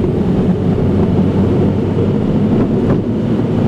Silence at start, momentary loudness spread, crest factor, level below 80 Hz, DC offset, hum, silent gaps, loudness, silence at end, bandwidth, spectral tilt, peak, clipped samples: 0 s; 2 LU; 6 dB; -30 dBFS; under 0.1%; none; none; -14 LUFS; 0 s; 8.2 kHz; -10 dB/octave; -6 dBFS; under 0.1%